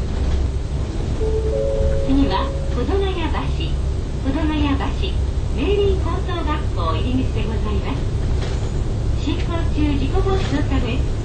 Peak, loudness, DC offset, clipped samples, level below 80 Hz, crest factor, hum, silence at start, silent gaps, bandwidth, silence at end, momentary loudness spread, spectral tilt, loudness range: -6 dBFS; -21 LUFS; under 0.1%; under 0.1%; -22 dBFS; 14 dB; none; 0 s; none; 9 kHz; 0 s; 5 LU; -7 dB/octave; 1 LU